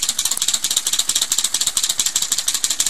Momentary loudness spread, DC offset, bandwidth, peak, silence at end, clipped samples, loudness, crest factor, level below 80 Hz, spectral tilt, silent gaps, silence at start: 1 LU; 2%; 17 kHz; -2 dBFS; 0 s; under 0.1%; -17 LUFS; 18 dB; -54 dBFS; 2.5 dB/octave; none; 0 s